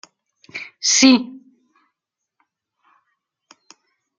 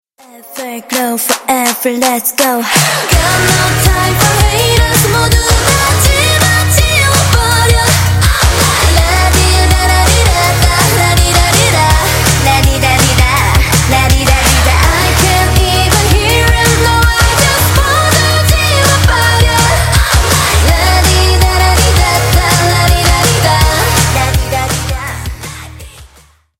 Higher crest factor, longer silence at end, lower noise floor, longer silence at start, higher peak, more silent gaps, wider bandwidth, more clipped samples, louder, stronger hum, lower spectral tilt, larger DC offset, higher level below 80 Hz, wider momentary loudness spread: first, 22 dB vs 10 dB; first, 2.85 s vs 0.55 s; first, -81 dBFS vs -44 dBFS; first, 0.55 s vs 0.35 s; about the same, -2 dBFS vs 0 dBFS; neither; second, 9.2 kHz vs 17 kHz; second, under 0.1% vs 0.1%; second, -14 LUFS vs -9 LUFS; neither; second, -1 dB/octave vs -3.5 dB/octave; neither; second, -68 dBFS vs -16 dBFS; first, 23 LU vs 4 LU